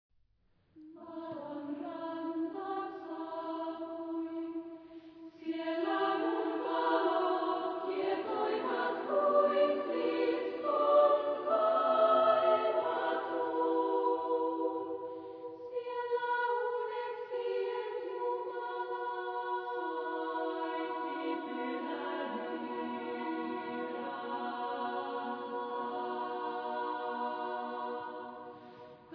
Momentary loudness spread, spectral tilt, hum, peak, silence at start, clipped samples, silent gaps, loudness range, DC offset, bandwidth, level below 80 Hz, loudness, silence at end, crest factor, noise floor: 13 LU; -1.5 dB/octave; none; -16 dBFS; 0.75 s; under 0.1%; none; 10 LU; under 0.1%; 5.2 kHz; -84 dBFS; -34 LUFS; 0 s; 18 dB; -72 dBFS